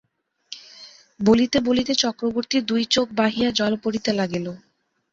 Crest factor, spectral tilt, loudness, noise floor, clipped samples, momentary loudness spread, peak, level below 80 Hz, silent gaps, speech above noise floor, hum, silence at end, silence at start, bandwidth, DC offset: 18 dB; -4 dB/octave; -21 LUFS; -46 dBFS; under 0.1%; 19 LU; -4 dBFS; -54 dBFS; none; 25 dB; none; 0.55 s; 0.5 s; 7.8 kHz; under 0.1%